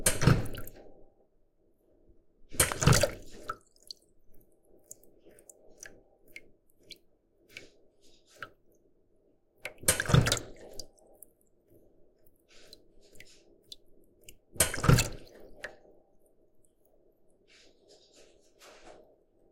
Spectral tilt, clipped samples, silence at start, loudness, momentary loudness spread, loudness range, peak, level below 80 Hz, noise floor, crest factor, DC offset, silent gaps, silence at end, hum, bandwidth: -4 dB/octave; under 0.1%; 0 s; -28 LUFS; 27 LU; 22 LU; -8 dBFS; -46 dBFS; -67 dBFS; 26 dB; under 0.1%; none; 0.6 s; none; 16.5 kHz